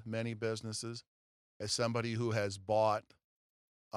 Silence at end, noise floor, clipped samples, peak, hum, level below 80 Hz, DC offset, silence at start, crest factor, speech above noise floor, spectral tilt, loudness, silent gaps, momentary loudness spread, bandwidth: 0 s; under -90 dBFS; under 0.1%; -18 dBFS; none; -74 dBFS; under 0.1%; 0 s; 20 dB; over 54 dB; -4.5 dB/octave; -36 LUFS; 1.07-1.60 s, 3.24-3.91 s; 11 LU; 13.5 kHz